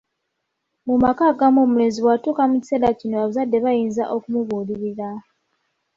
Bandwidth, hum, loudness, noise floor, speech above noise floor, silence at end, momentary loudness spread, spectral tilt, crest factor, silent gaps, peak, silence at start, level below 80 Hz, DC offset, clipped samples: 7.6 kHz; none; -19 LUFS; -76 dBFS; 57 dB; 0.75 s; 11 LU; -7 dB/octave; 16 dB; none; -4 dBFS; 0.85 s; -54 dBFS; under 0.1%; under 0.1%